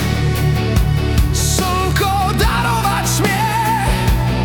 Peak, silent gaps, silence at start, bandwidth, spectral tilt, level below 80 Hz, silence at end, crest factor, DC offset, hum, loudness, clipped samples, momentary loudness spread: -2 dBFS; none; 0 s; 19 kHz; -4.5 dB/octave; -22 dBFS; 0 s; 12 dB; under 0.1%; none; -16 LUFS; under 0.1%; 1 LU